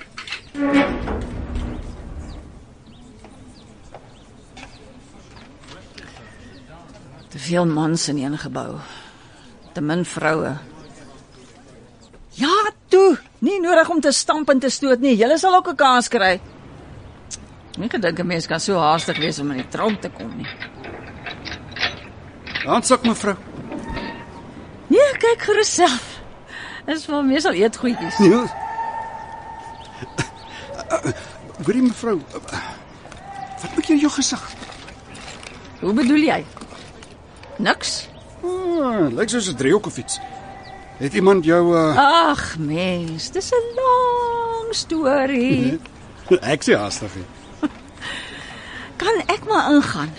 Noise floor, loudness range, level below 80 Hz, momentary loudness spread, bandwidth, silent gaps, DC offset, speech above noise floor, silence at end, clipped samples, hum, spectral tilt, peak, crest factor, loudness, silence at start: -45 dBFS; 9 LU; -44 dBFS; 22 LU; 10.5 kHz; none; under 0.1%; 27 dB; 0 s; under 0.1%; none; -4.5 dB/octave; -2 dBFS; 20 dB; -19 LUFS; 0 s